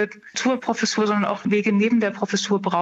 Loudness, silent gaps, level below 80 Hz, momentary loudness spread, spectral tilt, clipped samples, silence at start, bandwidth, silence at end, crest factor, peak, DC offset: -21 LUFS; none; -70 dBFS; 5 LU; -4.5 dB/octave; under 0.1%; 0 s; 8.2 kHz; 0 s; 14 dB; -6 dBFS; under 0.1%